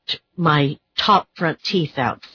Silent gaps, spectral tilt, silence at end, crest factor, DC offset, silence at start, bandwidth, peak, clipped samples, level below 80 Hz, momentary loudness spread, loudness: none; -6 dB/octave; 0.1 s; 18 dB; under 0.1%; 0.1 s; 5.4 kHz; -4 dBFS; under 0.1%; -56 dBFS; 7 LU; -20 LUFS